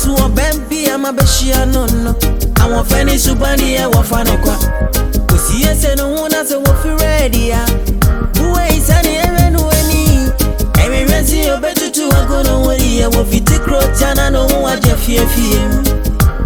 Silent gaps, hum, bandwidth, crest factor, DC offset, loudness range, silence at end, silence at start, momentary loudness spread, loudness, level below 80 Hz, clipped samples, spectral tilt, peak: none; none; 19.5 kHz; 10 dB; under 0.1%; 1 LU; 0 s; 0 s; 4 LU; -12 LUFS; -14 dBFS; under 0.1%; -4.5 dB/octave; 0 dBFS